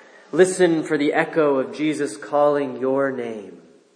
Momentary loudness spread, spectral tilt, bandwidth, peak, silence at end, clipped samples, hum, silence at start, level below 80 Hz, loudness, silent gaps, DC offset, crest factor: 9 LU; -5 dB/octave; 10.5 kHz; -4 dBFS; 0.4 s; under 0.1%; none; 0.35 s; -78 dBFS; -20 LUFS; none; under 0.1%; 18 dB